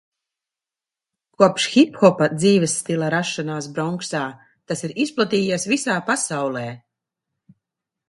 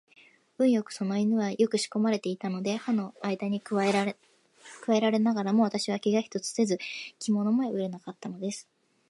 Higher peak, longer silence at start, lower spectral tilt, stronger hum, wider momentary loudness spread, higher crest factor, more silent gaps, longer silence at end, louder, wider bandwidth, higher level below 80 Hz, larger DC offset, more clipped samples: first, 0 dBFS vs -12 dBFS; first, 1.4 s vs 0.6 s; about the same, -4.5 dB/octave vs -5.5 dB/octave; neither; about the same, 11 LU vs 11 LU; about the same, 20 dB vs 16 dB; neither; first, 1.3 s vs 0.45 s; first, -20 LUFS vs -28 LUFS; about the same, 11.5 kHz vs 11.5 kHz; first, -66 dBFS vs -78 dBFS; neither; neither